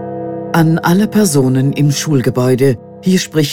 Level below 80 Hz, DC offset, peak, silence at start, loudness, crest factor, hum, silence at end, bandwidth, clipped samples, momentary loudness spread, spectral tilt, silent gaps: -48 dBFS; 0.7%; 0 dBFS; 0 s; -13 LUFS; 12 dB; none; 0 s; 17 kHz; under 0.1%; 5 LU; -6 dB/octave; none